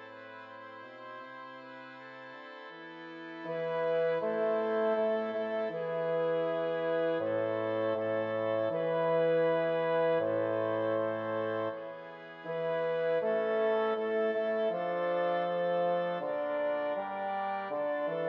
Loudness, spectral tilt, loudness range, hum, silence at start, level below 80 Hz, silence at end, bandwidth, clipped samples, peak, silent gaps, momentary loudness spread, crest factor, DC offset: -32 LUFS; -8 dB/octave; 5 LU; none; 0 s; under -90 dBFS; 0 s; 5.6 kHz; under 0.1%; -20 dBFS; none; 17 LU; 12 dB; under 0.1%